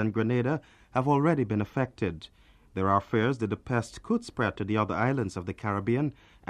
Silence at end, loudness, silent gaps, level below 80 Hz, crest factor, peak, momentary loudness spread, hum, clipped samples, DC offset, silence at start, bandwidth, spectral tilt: 0.4 s; -29 LUFS; none; -56 dBFS; 18 dB; -10 dBFS; 8 LU; none; under 0.1%; under 0.1%; 0 s; 11 kHz; -7.5 dB/octave